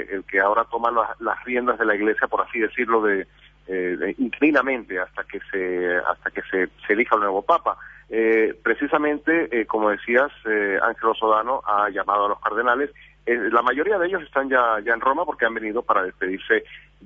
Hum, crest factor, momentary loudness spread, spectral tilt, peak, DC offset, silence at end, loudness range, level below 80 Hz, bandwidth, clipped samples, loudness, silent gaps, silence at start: none; 20 dB; 8 LU; -6.5 dB/octave; -2 dBFS; under 0.1%; 0.25 s; 2 LU; -56 dBFS; 6.4 kHz; under 0.1%; -22 LUFS; none; 0 s